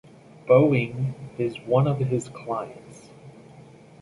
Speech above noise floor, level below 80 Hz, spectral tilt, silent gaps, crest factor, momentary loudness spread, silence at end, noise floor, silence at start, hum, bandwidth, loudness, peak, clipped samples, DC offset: 25 dB; -62 dBFS; -8 dB/octave; none; 20 dB; 16 LU; 0.4 s; -48 dBFS; 0.45 s; none; 11.5 kHz; -24 LUFS; -6 dBFS; under 0.1%; under 0.1%